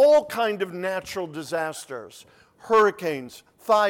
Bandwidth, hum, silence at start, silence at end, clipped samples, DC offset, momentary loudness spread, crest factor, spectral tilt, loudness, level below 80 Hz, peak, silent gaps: 17 kHz; none; 0 s; 0 s; under 0.1%; under 0.1%; 18 LU; 14 dB; -4 dB/octave; -24 LUFS; -66 dBFS; -10 dBFS; none